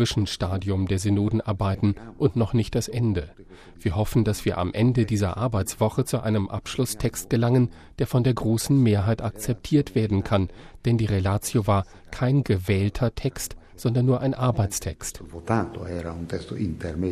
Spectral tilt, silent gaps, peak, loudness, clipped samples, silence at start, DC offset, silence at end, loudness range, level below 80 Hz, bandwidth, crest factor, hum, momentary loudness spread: -6.5 dB/octave; none; -8 dBFS; -25 LUFS; under 0.1%; 0 s; under 0.1%; 0 s; 2 LU; -42 dBFS; 14.5 kHz; 16 dB; none; 9 LU